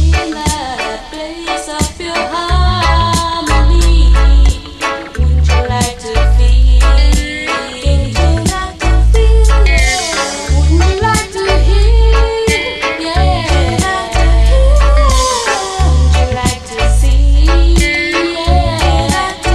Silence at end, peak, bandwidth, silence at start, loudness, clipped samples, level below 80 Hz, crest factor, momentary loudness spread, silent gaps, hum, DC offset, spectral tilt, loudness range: 0 s; 0 dBFS; 12.5 kHz; 0 s; -12 LUFS; under 0.1%; -12 dBFS; 10 dB; 7 LU; none; none; under 0.1%; -4.5 dB/octave; 1 LU